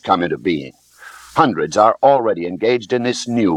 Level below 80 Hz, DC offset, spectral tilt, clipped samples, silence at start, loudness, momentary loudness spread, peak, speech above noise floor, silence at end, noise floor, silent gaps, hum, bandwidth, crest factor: -56 dBFS; under 0.1%; -5 dB/octave; under 0.1%; 0.05 s; -17 LUFS; 9 LU; 0 dBFS; 25 dB; 0 s; -41 dBFS; none; none; 13 kHz; 16 dB